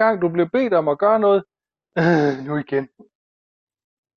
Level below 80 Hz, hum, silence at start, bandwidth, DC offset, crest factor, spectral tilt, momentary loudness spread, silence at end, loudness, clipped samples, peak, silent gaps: -64 dBFS; none; 0 s; 7 kHz; under 0.1%; 16 dB; -8 dB/octave; 9 LU; 1.3 s; -19 LUFS; under 0.1%; -4 dBFS; none